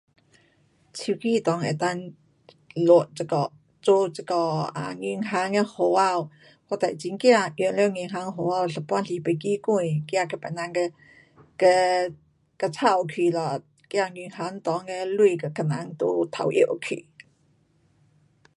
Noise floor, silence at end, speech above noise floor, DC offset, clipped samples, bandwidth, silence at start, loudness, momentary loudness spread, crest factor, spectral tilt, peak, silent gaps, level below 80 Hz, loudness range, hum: -64 dBFS; 1.55 s; 40 dB; under 0.1%; under 0.1%; 11.5 kHz; 0.95 s; -25 LUFS; 12 LU; 20 dB; -5.5 dB/octave; -4 dBFS; none; -72 dBFS; 3 LU; none